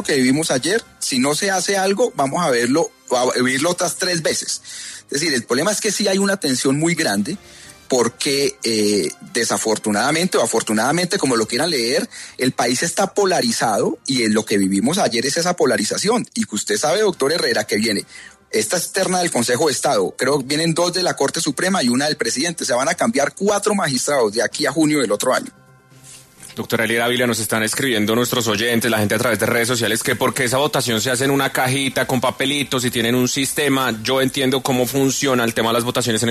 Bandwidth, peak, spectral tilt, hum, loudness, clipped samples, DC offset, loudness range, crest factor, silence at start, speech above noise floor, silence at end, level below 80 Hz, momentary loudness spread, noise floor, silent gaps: 13.5 kHz; -6 dBFS; -3.5 dB/octave; none; -18 LUFS; under 0.1%; under 0.1%; 2 LU; 14 dB; 0 s; 27 dB; 0 s; -56 dBFS; 4 LU; -46 dBFS; none